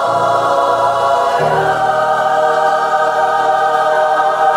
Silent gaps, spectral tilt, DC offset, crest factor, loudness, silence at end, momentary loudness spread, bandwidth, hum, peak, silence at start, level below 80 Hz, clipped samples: none; -4 dB/octave; under 0.1%; 12 dB; -13 LUFS; 0 s; 1 LU; 15.5 kHz; none; -2 dBFS; 0 s; -54 dBFS; under 0.1%